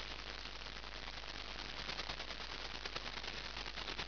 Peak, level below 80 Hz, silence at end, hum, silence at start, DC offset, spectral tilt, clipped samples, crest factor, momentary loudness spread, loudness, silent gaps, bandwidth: -28 dBFS; -54 dBFS; 0 s; none; 0 s; 0.2%; -0.5 dB/octave; under 0.1%; 18 dB; 4 LU; -44 LUFS; none; 5.4 kHz